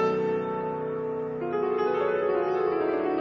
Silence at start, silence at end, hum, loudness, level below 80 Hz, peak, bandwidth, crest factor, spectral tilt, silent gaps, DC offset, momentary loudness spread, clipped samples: 0 s; 0 s; none; -27 LUFS; -66 dBFS; -16 dBFS; 6.2 kHz; 12 dB; -8 dB/octave; none; under 0.1%; 5 LU; under 0.1%